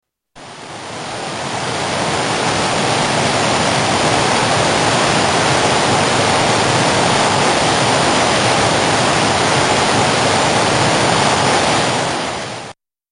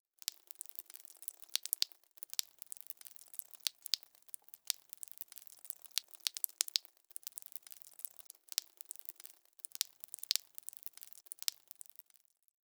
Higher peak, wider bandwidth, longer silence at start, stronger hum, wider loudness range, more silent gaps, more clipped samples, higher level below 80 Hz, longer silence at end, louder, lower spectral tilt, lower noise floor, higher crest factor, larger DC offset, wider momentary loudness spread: first, 0 dBFS vs -6 dBFS; second, 13 kHz vs over 20 kHz; about the same, 0.35 s vs 0.3 s; neither; about the same, 3 LU vs 3 LU; neither; neither; first, -42 dBFS vs under -90 dBFS; second, 0.4 s vs 1.1 s; first, -14 LUFS vs -41 LUFS; first, -3 dB/octave vs 6 dB/octave; second, -39 dBFS vs -71 dBFS; second, 14 dB vs 40 dB; neither; second, 9 LU vs 15 LU